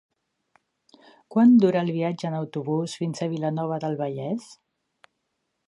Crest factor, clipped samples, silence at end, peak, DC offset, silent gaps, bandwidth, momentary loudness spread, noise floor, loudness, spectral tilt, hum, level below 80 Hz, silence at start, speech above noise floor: 16 dB; under 0.1%; 1.15 s; -8 dBFS; under 0.1%; none; 11 kHz; 13 LU; -78 dBFS; -24 LUFS; -7.5 dB/octave; none; -76 dBFS; 1.3 s; 55 dB